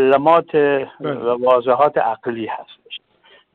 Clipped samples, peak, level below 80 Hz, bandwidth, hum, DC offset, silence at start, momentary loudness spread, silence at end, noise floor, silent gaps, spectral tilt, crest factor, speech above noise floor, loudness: under 0.1%; -4 dBFS; -62 dBFS; 4.4 kHz; none; under 0.1%; 0 s; 20 LU; 0.55 s; -53 dBFS; none; -8 dB/octave; 14 dB; 36 dB; -17 LUFS